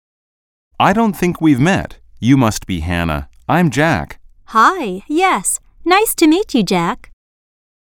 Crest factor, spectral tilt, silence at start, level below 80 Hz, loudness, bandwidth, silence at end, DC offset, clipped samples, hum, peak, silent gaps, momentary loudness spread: 16 dB; -5 dB/octave; 0.8 s; -38 dBFS; -15 LUFS; 18 kHz; 0.95 s; under 0.1%; under 0.1%; none; 0 dBFS; none; 9 LU